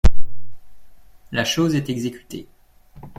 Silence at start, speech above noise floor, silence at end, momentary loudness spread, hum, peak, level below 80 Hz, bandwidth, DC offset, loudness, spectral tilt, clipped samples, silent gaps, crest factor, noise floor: 0.05 s; 24 dB; 0.1 s; 24 LU; none; 0 dBFS; -28 dBFS; 14.5 kHz; under 0.1%; -23 LUFS; -5 dB/octave; under 0.1%; none; 16 dB; -47 dBFS